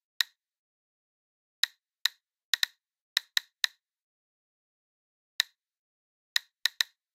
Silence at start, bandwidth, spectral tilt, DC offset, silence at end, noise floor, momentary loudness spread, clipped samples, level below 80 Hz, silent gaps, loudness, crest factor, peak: 0.2 s; 16.5 kHz; 8 dB/octave; under 0.1%; 0.3 s; under -90 dBFS; 3 LU; under 0.1%; under -90 dBFS; 0.58-1.63 s, 2.01-2.05 s, 2.44-2.53 s, 3.01-3.16 s, 4.02-5.39 s, 5.77-6.36 s; -31 LUFS; 30 dB; -6 dBFS